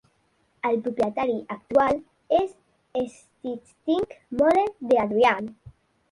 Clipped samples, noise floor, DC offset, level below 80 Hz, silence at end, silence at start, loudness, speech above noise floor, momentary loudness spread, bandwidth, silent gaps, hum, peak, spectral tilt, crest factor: under 0.1%; -67 dBFS; under 0.1%; -58 dBFS; 0.4 s; 0.65 s; -25 LUFS; 43 dB; 14 LU; 11.5 kHz; none; none; -6 dBFS; -6 dB/octave; 18 dB